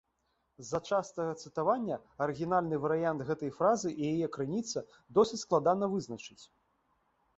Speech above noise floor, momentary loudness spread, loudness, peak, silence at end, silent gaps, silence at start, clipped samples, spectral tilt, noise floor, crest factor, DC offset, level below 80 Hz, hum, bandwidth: 46 dB; 9 LU; -32 LUFS; -12 dBFS; 0.9 s; none; 0.6 s; under 0.1%; -5.5 dB/octave; -78 dBFS; 20 dB; under 0.1%; -68 dBFS; none; 8.2 kHz